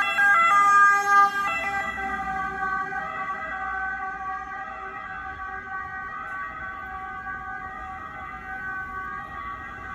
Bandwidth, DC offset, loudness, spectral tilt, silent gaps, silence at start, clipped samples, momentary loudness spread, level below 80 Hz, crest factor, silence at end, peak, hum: 16 kHz; under 0.1%; -25 LUFS; -2.5 dB/octave; none; 0 s; under 0.1%; 18 LU; -52 dBFS; 18 dB; 0 s; -8 dBFS; none